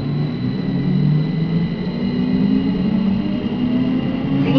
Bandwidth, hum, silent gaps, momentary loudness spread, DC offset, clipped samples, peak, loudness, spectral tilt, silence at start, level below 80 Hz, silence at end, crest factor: 5.4 kHz; none; none; 5 LU; under 0.1%; under 0.1%; -4 dBFS; -19 LUFS; -10 dB/octave; 0 s; -40 dBFS; 0 s; 14 dB